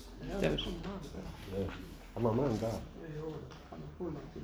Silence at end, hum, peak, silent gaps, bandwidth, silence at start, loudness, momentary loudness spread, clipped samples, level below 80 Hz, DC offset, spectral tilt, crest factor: 0 s; none; -18 dBFS; none; over 20 kHz; 0 s; -38 LUFS; 14 LU; under 0.1%; -50 dBFS; under 0.1%; -6.5 dB/octave; 20 dB